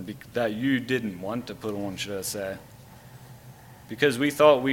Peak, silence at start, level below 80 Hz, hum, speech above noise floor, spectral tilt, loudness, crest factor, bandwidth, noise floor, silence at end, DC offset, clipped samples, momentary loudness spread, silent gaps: -4 dBFS; 0 s; -60 dBFS; none; 22 dB; -4.5 dB/octave; -26 LUFS; 22 dB; 17 kHz; -48 dBFS; 0 s; under 0.1%; under 0.1%; 22 LU; none